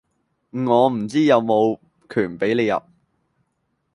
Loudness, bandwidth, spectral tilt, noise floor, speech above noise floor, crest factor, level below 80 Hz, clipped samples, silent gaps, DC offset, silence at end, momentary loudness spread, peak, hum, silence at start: -20 LUFS; 11.5 kHz; -6.5 dB/octave; -72 dBFS; 53 dB; 18 dB; -62 dBFS; under 0.1%; none; under 0.1%; 1.15 s; 10 LU; -2 dBFS; none; 0.55 s